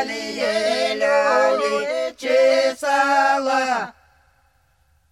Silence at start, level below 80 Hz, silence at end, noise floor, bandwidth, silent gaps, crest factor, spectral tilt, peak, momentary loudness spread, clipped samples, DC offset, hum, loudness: 0 s; -64 dBFS; 1.2 s; -61 dBFS; 13.5 kHz; none; 16 dB; -2 dB/octave; -4 dBFS; 8 LU; under 0.1%; under 0.1%; none; -19 LUFS